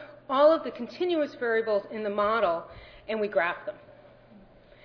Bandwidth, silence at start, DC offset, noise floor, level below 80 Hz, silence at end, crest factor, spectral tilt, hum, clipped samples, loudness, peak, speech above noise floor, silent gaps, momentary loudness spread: 5.4 kHz; 0 s; under 0.1%; -54 dBFS; -62 dBFS; 0.95 s; 18 dB; -6.5 dB/octave; none; under 0.1%; -27 LUFS; -10 dBFS; 27 dB; none; 16 LU